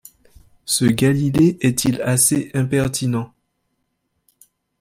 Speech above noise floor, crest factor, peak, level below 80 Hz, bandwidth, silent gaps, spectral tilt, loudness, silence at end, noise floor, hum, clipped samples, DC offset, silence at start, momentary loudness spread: 54 dB; 18 dB; -2 dBFS; -50 dBFS; 16.5 kHz; none; -5 dB/octave; -18 LUFS; 1.55 s; -72 dBFS; none; under 0.1%; under 0.1%; 0.65 s; 8 LU